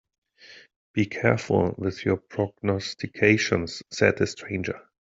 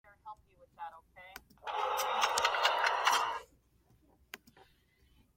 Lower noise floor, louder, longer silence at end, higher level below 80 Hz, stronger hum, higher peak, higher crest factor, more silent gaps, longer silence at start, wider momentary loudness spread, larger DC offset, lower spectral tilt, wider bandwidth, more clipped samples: second, -51 dBFS vs -69 dBFS; first, -25 LUFS vs -31 LUFS; second, 0.4 s vs 1 s; first, -58 dBFS vs -70 dBFS; neither; first, -4 dBFS vs -12 dBFS; about the same, 22 dB vs 26 dB; first, 0.76-0.94 s vs none; first, 0.45 s vs 0.25 s; second, 11 LU vs 23 LU; neither; first, -5.5 dB/octave vs 1 dB/octave; second, 7.8 kHz vs 16.5 kHz; neither